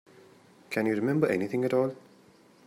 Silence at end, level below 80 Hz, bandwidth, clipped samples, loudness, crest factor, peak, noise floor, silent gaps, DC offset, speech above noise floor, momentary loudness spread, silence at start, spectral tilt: 0.7 s; -74 dBFS; 16 kHz; under 0.1%; -28 LUFS; 20 dB; -10 dBFS; -58 dBFS; none; under 0.1%; 31 dB; 8 LU; 0.7 s; -7.5 dB/octave